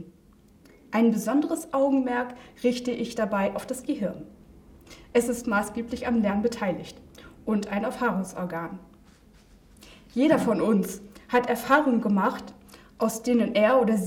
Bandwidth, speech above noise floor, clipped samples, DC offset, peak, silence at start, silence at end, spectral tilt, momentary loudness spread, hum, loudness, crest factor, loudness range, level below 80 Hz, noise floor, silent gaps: 17.5 kHz; 31 dB; under 0.1%; under 0.1%; -8 dBFS; 0 s; 0 s; -5.5 dB/octave; 13 LU; none; -26 LUFS; 18 dB; 5 LU; -58 dBFS; -56 dBFS; none